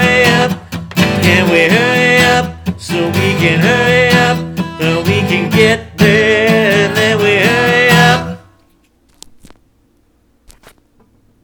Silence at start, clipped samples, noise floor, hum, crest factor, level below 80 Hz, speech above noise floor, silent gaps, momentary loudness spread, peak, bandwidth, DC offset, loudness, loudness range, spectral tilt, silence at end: 0 s; under 0.1%; -54 dBFS; none; 12 dB; -40 dBFS; 43 dB; none; 9 LU; 0 dBFS; over 20 kHz; under 0.1%; -10 LUFS; 4 LU; -5 dB/octave; 3.05 s